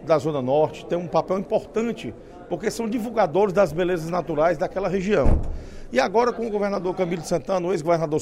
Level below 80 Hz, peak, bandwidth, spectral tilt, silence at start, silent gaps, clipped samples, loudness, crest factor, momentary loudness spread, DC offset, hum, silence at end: -34 dBFS; -4 dBFS; 15.5 kHz; -6.5 dB/octave; 0 s; none; under 0.1%; -23 LUFS; 18 dB; 8 LU; under 0.1%; none; 0 s